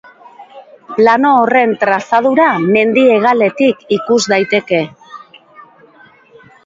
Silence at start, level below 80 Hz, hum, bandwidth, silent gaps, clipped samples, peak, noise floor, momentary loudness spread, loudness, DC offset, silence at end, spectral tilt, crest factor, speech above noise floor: 0.4 s; -60 dBFS; none; 7.8 kHz; none; under 0.1%; 0 dBFS; -44 dBFS; 7 LU; -12 LUFS; under 0.1%; 1.05 s; -5 dB/octave; 14 dB; 33 dB